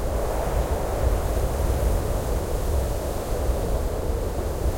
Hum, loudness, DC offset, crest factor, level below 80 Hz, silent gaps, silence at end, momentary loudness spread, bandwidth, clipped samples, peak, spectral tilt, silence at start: none; -26 LUFS; under 0.1%; 14 dB; -26 dBFS; none; 0 s; 3 LU; 16.5 kHz; under 0.1%; -10 dBFS; -6 dB/octave; 0 s